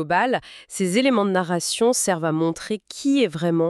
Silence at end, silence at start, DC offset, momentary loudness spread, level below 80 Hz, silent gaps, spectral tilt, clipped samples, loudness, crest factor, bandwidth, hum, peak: 0 s; 0 s; under 0.1%; 8 LU; -62 dBFS; none; -4.5 dB/octave; under 0.1%; -21 LUFS; 16 dB; 13.5 kHz; none; -6 dBFS